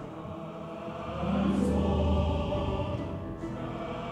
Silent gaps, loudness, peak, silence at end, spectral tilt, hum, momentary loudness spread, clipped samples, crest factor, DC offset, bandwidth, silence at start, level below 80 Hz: none; -32 LUFS; -14 dBFS; 0 s; -8 dB/octave; none; 13 LU; under 0.1%; 16 dB; under 0.1%; 10.5 kHz; 0 s; -38 dBFS